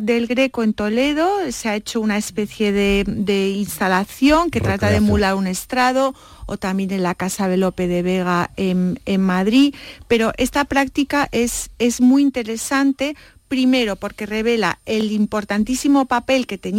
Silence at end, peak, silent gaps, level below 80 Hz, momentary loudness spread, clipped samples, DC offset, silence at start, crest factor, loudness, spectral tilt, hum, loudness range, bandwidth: 0 s; -4 dBFS; none; -40 dBFS; 7 LU; under 0.1%; under 0.1%; 0 s; 14 dB; -19 LUFS; -5 dB/octave; none; 2 LU; 16.5 kHz